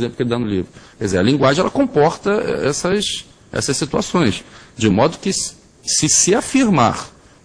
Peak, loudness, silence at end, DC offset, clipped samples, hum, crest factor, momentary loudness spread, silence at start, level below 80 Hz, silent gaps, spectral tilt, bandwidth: 0 dBFS; -17 LUFS; 0.35 s; under 0.1%; under 0.1%; none; 18 dB; 13 LU; 0 s; -44 dBFS; none; -4 dB/octave; 10.5 kHz